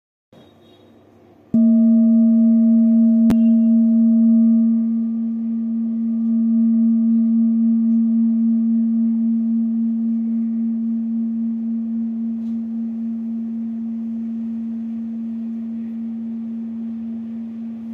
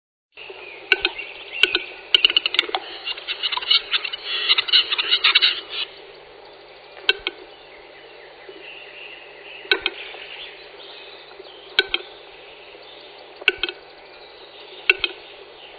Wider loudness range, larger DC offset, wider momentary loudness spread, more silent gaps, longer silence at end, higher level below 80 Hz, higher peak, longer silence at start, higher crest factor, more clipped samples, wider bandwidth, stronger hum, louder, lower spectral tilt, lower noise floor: about the same, 12 LU vs 11 LU; neither; second, 13 LU vs 25 LU; neither; about the same, 0 s vs 0 s; about the same, -62 dBFS vs -60 dBFS; second, -8 dBFS vs 0 dBFS; first, 1.55 s vs 0.35 s; second, 10 dB vs 26 dB; neither; second, 1.4 kHz vs 8 kHz; neither; about the same, -18 LUFS vs -19 LUFS; first, -10.5 dB/octave vs -1 dB/octave; first, -49 dBFS vs -44 dBFS